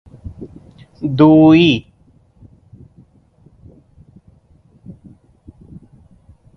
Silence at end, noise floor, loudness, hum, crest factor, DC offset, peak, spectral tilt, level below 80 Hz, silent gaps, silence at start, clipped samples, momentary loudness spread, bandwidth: 1.65 s; -52 dBFS; -11 LUFS; none; 18 dB; under 0.1%; 0 dBFS; -8 dB/octave; -46 dBFS; none; 0.25 s; under 0.1%; 29 LU; 6.2 kHz